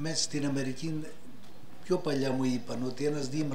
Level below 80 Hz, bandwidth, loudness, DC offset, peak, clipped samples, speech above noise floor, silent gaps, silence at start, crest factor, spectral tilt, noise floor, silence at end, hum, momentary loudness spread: -66 dBFS; 16 kHz; -32 LUFS; 2%; -16 dBFS; under 0.1%; 21 dB; none; 0 s; 16 dB; -5 dB/octave; -53 dBFS; 0 s; none; 17 LU